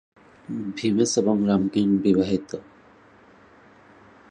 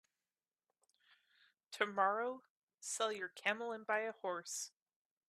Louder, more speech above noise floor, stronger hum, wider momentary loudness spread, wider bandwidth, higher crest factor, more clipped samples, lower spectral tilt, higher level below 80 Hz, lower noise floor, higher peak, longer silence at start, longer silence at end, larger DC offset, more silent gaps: first, -22 LUFS vs -40 LUFS; second, 31 dB vs over 50 dB; neither; about the same, 14 LU vs 14 LU; second, 9.8 kHz vs 15 kHz; second, 18 dB vs 24 dB; neither; first, -6 dB/octave vs -1.5 dB/octave; first, -56 dBFS vs under -90 dBFS; second, -53 dBFS vs under -90 dBFS; first, -8 dBFS vs -18 dBFS; second, 0.5 s vs 1.7 s; first, 1.7 s vs 0.6 s; neither; second, none vs 2.50-2.68 s, 2.74-2.78 s